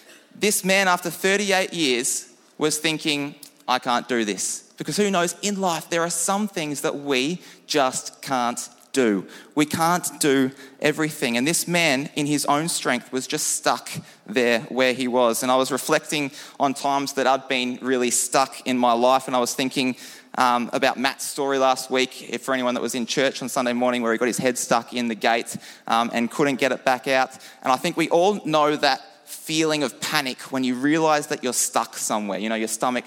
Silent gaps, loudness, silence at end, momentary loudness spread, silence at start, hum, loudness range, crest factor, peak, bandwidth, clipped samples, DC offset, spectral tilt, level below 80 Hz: none; -22 LUFS; 0 s; 7 LU; 0.1 s; none; 2 LU; 20 dB; -2 dBFS; 17.5 kHz; under 0.1%; under 0.1%; -3 dB/octave; -72 dBFS